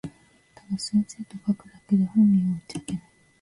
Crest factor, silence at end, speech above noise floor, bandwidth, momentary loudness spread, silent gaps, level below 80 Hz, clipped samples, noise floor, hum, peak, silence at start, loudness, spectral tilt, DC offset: 14 dB; 0.4 s; 32 dB; 11.5 kHz; 15 LU; none; -60 dBFS; under 0.1%; -56 dBFS; none; -12 dBFS; 0.05 s; -25 LUFS; -6.5 dB/octave; under 0.1%